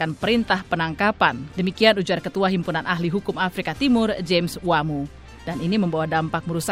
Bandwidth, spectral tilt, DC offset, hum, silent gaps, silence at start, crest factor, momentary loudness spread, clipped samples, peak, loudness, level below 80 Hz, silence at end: 16 kHz; -5.5 dB/octave; under 0.1%; none; none; 0 s; 20 dB; 8 LU; under 0.1%; -2 dBFS; -22 LUFS; -48 dBFS; 0 s